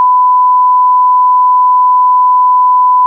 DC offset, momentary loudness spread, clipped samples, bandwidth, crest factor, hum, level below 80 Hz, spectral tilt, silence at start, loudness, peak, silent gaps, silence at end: under 0.1%; 0 LU; under 0.1%; 1.1 kHz; 4 dB; none; under -90 dBFS; -4 dB/octave; 0 s; -7 LUFS; -4 dBFS; none; 0 s